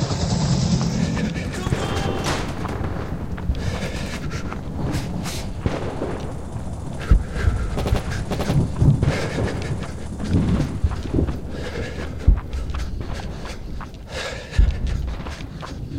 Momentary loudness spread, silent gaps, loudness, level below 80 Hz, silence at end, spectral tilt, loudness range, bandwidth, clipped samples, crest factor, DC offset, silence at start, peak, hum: 11 LU; none; -25 LUFS; -28 dBFS; 0 s; -6 dB/octave; 5 LU; 15.5 kHz; under 0.1%; 18 dB; 2%; 0 s; -4 dBFS; none